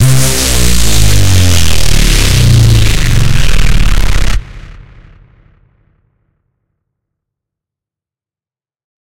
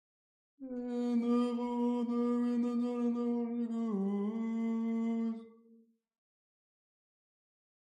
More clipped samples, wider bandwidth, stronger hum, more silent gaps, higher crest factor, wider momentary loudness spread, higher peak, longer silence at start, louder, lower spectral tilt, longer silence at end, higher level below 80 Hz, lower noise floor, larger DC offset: first, 0.2% vs under 0.1%; first, 17.5 kHz vs 7.6 kHz; neither; neither; about the same, 10 dB vs 14 dB; about the same, 7 LU vs 7 LU; first, 0 dBFS vs -22 dBFS; second, 0 s vs 0.6 s; first, -10 LUFS vs -34 LUFS; second, -4 dB/octave vs -8 dB/octave; second, 0.2 s vs 2.45 s; first, -14 dBFS vs -84 dBFS; first, under -90 dBFS vs -65 dBFS; neither